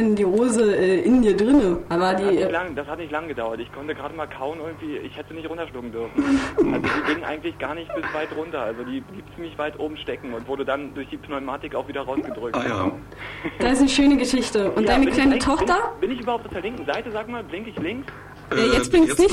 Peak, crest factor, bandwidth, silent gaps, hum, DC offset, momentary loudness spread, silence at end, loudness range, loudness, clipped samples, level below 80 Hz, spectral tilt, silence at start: -6 dBFS; 16 dB; 13.5 kHz; none; none; under 0.1%; 15 LU; 0 s; 10 LU; -23 LUFS; under 0.1%; -42 dBFS; -5 dB/octave; 0 s